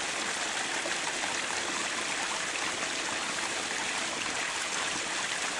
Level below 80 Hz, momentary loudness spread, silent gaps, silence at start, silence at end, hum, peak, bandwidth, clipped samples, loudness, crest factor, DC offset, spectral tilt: -68 dBFS; 1 LU; none; 0 s; 0 s; none; -14 dBFS; 11.5 kHz; under 0.1%; -30 LUFS; 18 dB; under 0.1%; 0 dB/octave